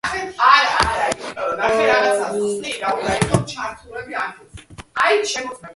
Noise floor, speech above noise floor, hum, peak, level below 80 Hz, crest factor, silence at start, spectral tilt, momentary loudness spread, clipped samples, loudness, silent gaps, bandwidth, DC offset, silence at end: -40 dBFS; 17 dB; none; 0 dBFS; -44 dBFS; 20 dB; 0.05 s; -3.5 dB/octave; 15 LU; under 0.1%; -19 LUFS; none; 11.5 kHz; under 0.1%; 0.05 s